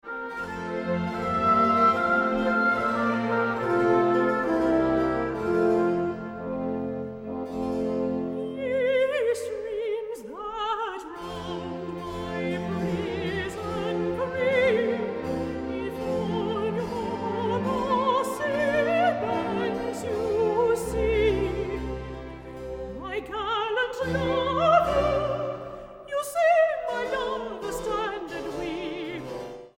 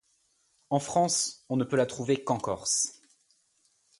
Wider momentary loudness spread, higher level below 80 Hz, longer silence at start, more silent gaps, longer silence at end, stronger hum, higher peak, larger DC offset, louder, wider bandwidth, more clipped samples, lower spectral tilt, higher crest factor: first, 12 LU vs 6 LU; first, -46 dBFS vs -66 dBFS; second, 0.05 s vs 0.7 s; neither; second, 0.1 s vs 1.05 s; neither; first, -8 dBFS vs -12 dBFS; neither; about the same, -26 LUFS vs -28 LUFS; first, 16 kHz vs 11.5 kHz; neither; first, -6 dB/octave vs -3.5 dB/octave; about the same, 18 dB vs 18 dB